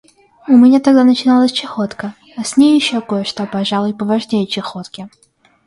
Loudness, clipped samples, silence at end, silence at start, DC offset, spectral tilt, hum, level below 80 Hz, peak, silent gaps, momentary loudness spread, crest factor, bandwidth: -13 LUFS; under 0.1%; 0.6 s; 0.45 s; under 0.1%; -5 dB/octave; none; -58 dBFS; 0 dBFS; none; 18 LU; 14 dB; 11.5 kHz